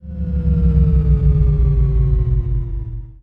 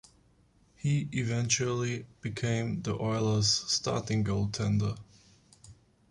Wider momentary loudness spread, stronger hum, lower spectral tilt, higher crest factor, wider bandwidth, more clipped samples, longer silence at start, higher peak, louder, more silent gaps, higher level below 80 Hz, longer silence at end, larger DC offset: about the same, 9 LU vs 9 LU; neither; first, -12.5 dB/octave vs -4.5 dB/octave; second, 12 dB vs 20 dB; second, 2.6 kHz vs 11.5 kHz; neither; second, 0.05 s vs 0.85 s; first, -2 dBFS vs -12 dBFS; first, -17 LUFS vs -30 LUFS; neither; first, -16 dBFS vs -54 dBFS; second, 0.1 s vs 0.4 s; neither